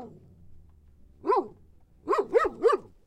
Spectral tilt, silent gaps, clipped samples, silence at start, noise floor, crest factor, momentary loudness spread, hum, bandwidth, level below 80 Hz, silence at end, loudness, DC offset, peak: -5.5 dB/octave; none; under 0.1%; 0 s; -56 dBFS; 18 dB; 20 LU; none; 11.5 kHz; -58 dBFS; 0.25 s; -27 LUFS; under 0.1%; -10 dBFS